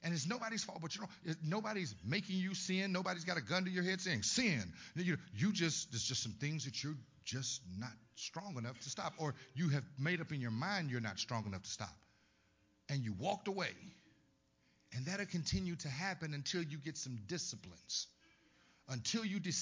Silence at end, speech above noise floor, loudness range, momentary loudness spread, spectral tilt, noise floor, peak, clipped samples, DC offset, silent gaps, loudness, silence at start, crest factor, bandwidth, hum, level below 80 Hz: 0 s; 34 dB; 6 LU; 9 LU; -4 dB/octave; -75 dBFS; -22 dBFS; under 0.1%; under 0.1%; none; -41 LUFS; 0 s; 18 dB; 7.8 kHz; none; -66 dBFS